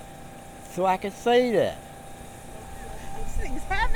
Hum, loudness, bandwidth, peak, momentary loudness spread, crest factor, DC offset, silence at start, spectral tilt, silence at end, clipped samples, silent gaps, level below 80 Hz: none; -26 LUFS; 18 kHz; -10 dBFS; 21 LU; 16 dB; under 0.1%; 0 s; -5 dB/octave; 0 s; under 0.1%; none; -36 dBFS